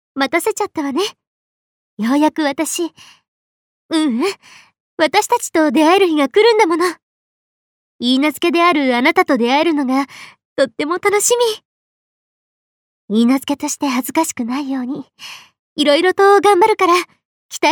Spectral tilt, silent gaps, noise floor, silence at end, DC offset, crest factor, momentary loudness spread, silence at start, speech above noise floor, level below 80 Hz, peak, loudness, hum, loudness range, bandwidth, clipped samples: -2.5 dB/octave; 1.27-1.97 s, 3.28-3.89 s, 4.80-4.98 s, 7.02-7.99 s, 10.45-10.56 s, 11.65-13.08 s, 15.59-15.76 s, 17.25-17.49 s; under -90 dBFS; 0 s; under 0.1%; 14 dB; 14 LU; 0.15 s; over 75 dB; -70 dBFS; -2 dBFS; -15 LUFS; none; 5 LU; over 20 kHz; under 0.1%